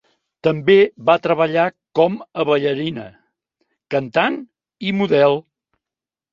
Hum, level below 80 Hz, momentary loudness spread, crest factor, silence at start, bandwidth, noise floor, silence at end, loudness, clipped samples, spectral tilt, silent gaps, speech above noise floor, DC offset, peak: none; -62 dBFS; 11 LU; 18 dB; 0.45 s; 7.2 kHz; -89 dBFS; 0.95 s; -18 LUFS; under 0.1%; -7.5 dB/octave; none; 72 dB; under 0.1%; -2 dBFS